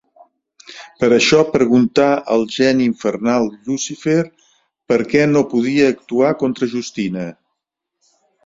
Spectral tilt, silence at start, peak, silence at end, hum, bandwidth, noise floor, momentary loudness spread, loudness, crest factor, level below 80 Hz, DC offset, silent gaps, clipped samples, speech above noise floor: -5 dB/octave; 0.7 s; -2 dBFS; 1.15 s; none; 7.8 kHz; -78 dBFS; 10 LU; -16 LUFS; 16 dB; -54 dBFS; under 0.1%; none; under 0.1%; 62 dB